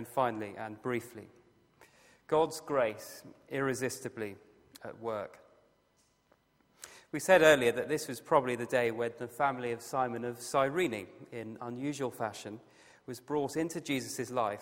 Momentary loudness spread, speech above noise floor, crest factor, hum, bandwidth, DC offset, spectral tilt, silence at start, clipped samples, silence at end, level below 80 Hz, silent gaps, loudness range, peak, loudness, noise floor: 18 LU; 39 dB; 24 dB; none; 16 kHz; under 0.1%; -4.5 dB/octave; 0 s; under 0.1%; 0 s; -72 dBFS; none; 11 LU; -8 dBFS; -32 LUFS; -72 dBFS